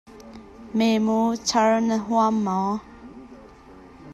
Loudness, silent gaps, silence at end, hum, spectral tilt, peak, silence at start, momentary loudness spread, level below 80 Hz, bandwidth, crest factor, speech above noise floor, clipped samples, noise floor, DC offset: -22 LUFS; none; 0 s; none; -5 dB/octave; -8 dBFS; 0.1 s; 24 LU; -56 dBFS; 12.5 kHz; 16 dB; 25 dB; under 0.1%; -46 dBFS; under 0.1%